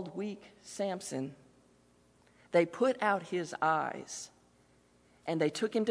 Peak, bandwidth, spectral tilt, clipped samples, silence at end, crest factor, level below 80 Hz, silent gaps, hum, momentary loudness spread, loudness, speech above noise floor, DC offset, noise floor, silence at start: -14 dBFS; 11 kHz; -4.5 dB/octave; under 0.1%; 0 s; 20 dB; -78 dBFS; none; 60 Hz at -65 dBFS; 14 LU; -33 LUFS; 33 dB; under 0.1%; -66 dBFS; 0 s